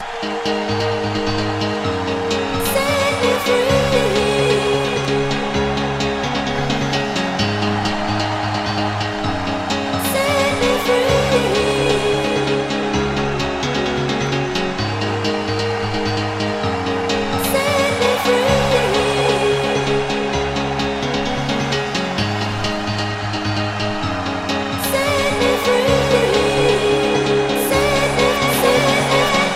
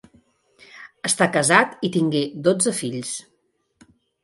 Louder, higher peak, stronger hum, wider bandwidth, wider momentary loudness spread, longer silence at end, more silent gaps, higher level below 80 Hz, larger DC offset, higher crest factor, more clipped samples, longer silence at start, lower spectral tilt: about the same, -18 LUFS vs -20 LUFS; about the same, -2 dBFS vs 0 dBFS; neither; first, 16 kHz vs 12 kHz; second, 6 LU vs 13 LU; second, 0 s vs 1 s; neither; first, -38 dBFS vs -66 dBFS; neither; second, 16 dB vs 22 dB; neither; second, 0 s vs 0.75 s; about the same, -4.5 dB/octave vs -3.5 dB/octave